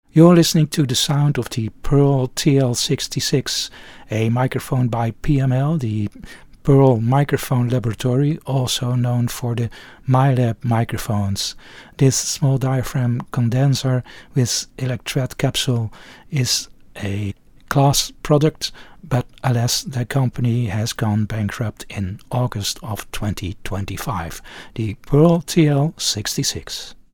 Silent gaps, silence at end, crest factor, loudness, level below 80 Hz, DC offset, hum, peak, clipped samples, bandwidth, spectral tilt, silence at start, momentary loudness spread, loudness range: none; 0.2 s; 18 dB; -19 LUFS; -40 dBFS; under 0.1%; none; 0 dBFS; under 0.1%; 18 kHz; -5.5 dB/octave; 0.15 s; 12 LU; 4 LU